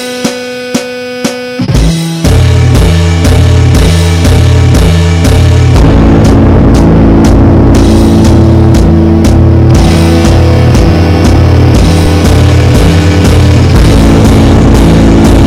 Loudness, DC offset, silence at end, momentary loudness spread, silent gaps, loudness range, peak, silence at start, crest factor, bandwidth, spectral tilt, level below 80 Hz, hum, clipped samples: -5 LUFS; under 0.1%; 0 s; 6 LU; none; 2 LU; 0 dBFS; 0 s; 4 dB; 14 kHz; -6.5 dB/octave; -10 dBFS; none; 10%